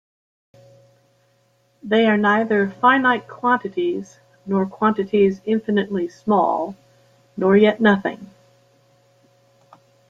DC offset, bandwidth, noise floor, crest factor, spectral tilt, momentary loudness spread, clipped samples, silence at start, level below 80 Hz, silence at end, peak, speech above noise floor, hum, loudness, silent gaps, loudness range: under 0.1%; 7.2 kHz; -62 dBFS; 18 dB; -7.5 dB/octave; 13 LU; under 0.1%; 1.85 s; -64 dBFS; 1.85 s; -2 dBFS; 43 dB; none; -19 LUFS; none; 2 LU